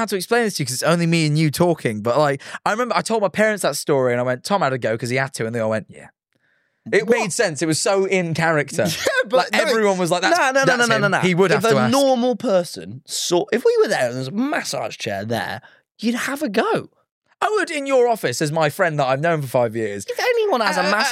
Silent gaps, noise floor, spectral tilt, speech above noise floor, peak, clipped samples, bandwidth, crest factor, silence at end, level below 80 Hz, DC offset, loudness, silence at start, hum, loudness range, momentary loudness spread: 17.11-17.22 s; -65 dBFS; -4.5 dB/octave; 46 dB; -4 dBFS; under 0.1%; 16 kHz; 16 dB; 0 s; -66 dBFS; under 0.1%; -19 LUFS; 0 s; none; 5 LU; 8 LU